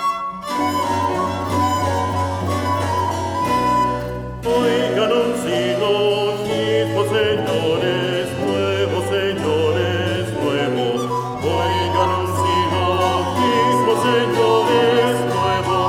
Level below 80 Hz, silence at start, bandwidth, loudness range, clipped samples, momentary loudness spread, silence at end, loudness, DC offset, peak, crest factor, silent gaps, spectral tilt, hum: -46 dBFS; 0 s; 17 kHz; 3 LU; under 0.1%; 6 LU; 0 s; -19 LUFS; under 0.1%; -4 dBFS; 14 dB; none; -5.5 dB/octave; none